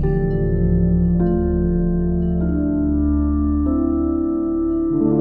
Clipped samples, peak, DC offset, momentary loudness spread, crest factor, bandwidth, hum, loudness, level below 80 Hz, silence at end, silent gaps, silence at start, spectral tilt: under 0.1%; -6 dBFS; under 0.1%; 3 LU; 12 dB; 1.9 kHz; none; -19 LUFS; -24 dBFS; 0 s; none; 0 s; -14 dB/octave